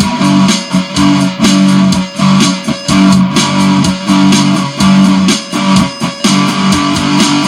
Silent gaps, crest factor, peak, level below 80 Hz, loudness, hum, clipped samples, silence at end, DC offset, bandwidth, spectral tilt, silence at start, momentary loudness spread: none; 8 dB; 0 dBFS; -38 dBFS; -9 LUFS; none; under 0.1%; 0 s; under 0.1%; 14 kHz; -4.5 dB/octave; 0 s; 4 LU